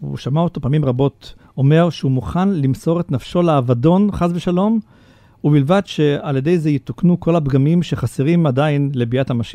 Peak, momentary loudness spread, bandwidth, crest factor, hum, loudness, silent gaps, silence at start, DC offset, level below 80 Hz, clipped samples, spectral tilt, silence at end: -2 dBFS; 5 LU; 10 kHz; 14 dB; none; -17 LUFS; none; 0 s; under 0.1%; -42 dBFS; under 0.1%; -8.5 dB/octave; 0 s